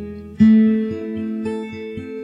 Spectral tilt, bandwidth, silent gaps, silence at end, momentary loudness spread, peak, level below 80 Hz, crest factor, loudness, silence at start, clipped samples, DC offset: -9 dB/octave; 5.4 kHz; none; 0 s; 17 LU; -2 dBFS; -50 dBFS; 16 dB; -18 LUFS; 0 s; under 0.1%; under 0.1%